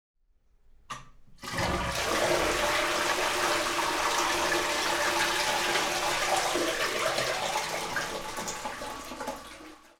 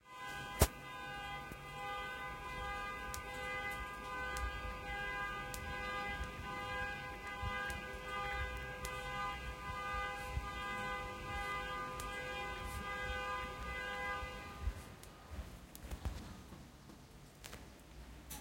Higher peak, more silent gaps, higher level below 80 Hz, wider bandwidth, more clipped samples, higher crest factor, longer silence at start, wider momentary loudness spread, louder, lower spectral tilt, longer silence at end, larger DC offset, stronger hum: about the same, -12 dBFS vs -14 dBFS; neither; about the same, -50 dBFS vs -50 dBFS; first, over 20 kHz vs 16.5 kHz; neither; second, 18 dB vs 30 dB; first, 0.9 s vs 0.05 s; about the same, 12 LU vs 12 LU; first, -28 LUFS vs -43 LUFS; second, -2 dB/octave vs -3.5 dB/octave; first, 0.2 s vs 0 s; neither; neither